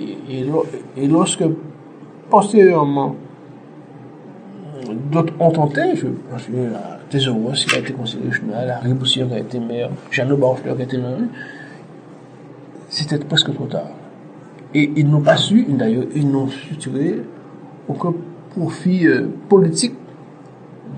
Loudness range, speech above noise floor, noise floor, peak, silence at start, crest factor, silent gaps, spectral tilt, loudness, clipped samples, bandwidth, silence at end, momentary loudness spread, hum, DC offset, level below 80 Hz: 5 LU; 22 dB; -39 dBFS; 0 dBFS; 0 s; 18 dB; none; -5.5 dB/octave; -18 LUFS; under 0.1%; 9.4 kHz; 0 s; 24 LU; none; under 0.1%; -62 dBFS